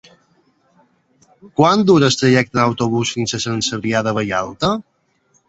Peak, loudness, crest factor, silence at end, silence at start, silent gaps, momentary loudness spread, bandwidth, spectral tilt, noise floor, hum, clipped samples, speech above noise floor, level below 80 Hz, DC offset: -2 dBFS; -16 LUFS; 16 dB; 0.7 s; 1.45 s; none; 8 LU; 8.2 kHz; -5 dB/octave; -61 dBFS; none; under 0.1%; 45 dB; -52 dBFS; under 0.1%